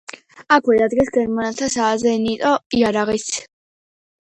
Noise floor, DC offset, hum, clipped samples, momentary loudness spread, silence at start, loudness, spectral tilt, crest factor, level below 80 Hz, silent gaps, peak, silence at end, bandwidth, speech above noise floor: under -90 dBFS; under 0.1%; none; under 0.1%; 7 LU; 0.35 s; -18 LUFS; -3.5 dB/octave; 18 dB; -52 dBFS; 2.66-2.70 s; 0 dBFS; 0.9 s; 10 kHz; over 72 dB